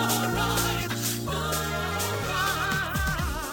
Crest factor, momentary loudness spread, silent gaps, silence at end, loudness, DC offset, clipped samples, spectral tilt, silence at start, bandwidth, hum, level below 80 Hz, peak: 16 dB; 3 LU; none; 0 s; -27 LUFS; under 0.1%; under 0.1%; -3.5 dB/octave; 0 s; 17 kHz; none; -38 dBFS; -10 dBFS